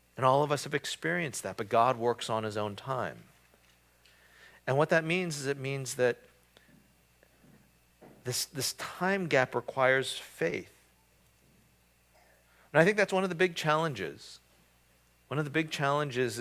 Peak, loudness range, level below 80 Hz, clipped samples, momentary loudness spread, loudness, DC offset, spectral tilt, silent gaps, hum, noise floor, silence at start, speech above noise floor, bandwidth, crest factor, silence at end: -8 dBFS; 5 LU; -70 dBFS; under 0.1%; 10 LU; -30 LUFS; under 0.1%; -4.5 dB/octave; none; 60 Hz at -65 dBFS; -66 dBFS; 0.15 s; 36 dB; 16 kHz; 24 dB; 0 s